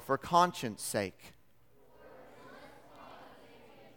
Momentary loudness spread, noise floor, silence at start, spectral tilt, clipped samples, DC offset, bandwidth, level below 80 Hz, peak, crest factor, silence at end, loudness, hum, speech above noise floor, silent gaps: 27 LU; -67 dBFS; 0 s; -4 dB/octave; under 0.1%; under 0.1%; 19 kHz; -70 dBFS; -12 dBFS; 26 dB; 0.65 s; -32 LUFS; none; 35 dB; none